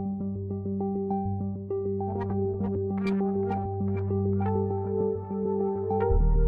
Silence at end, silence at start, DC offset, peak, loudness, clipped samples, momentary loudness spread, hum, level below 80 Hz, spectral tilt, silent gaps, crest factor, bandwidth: 0 s; 0 s; under 0.1%; -14 dBFS; -29 LUFS; under 0.1%; 5 LU; none; -34 dBFS; -11.5 dB/octave; none; 14 dB; 5 kHz